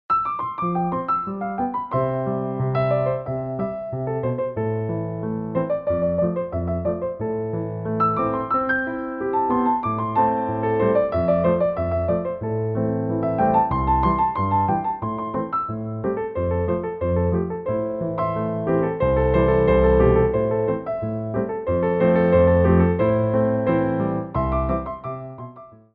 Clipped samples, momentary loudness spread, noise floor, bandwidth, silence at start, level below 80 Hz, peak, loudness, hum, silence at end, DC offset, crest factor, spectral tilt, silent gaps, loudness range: under 0.1%; 9 LU; -42 dBFS; 5 kHz; 0.1 s; -36 dBFS; -4 dBFS; -22 LUFS; none; 0.2 s; under 0.1%; 16 dB; -12 dB/octave; none; 5 LU